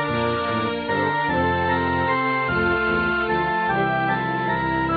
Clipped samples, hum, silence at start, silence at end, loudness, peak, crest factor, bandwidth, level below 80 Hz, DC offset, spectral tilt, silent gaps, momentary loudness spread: under 0.1%; none; 0 s; 0 s; -21 LUFS; -10 dBFS; 12 dB; 4.9 kHz; -44 dBFS; under 0.1%; -9 dB/octave; none; 2 LU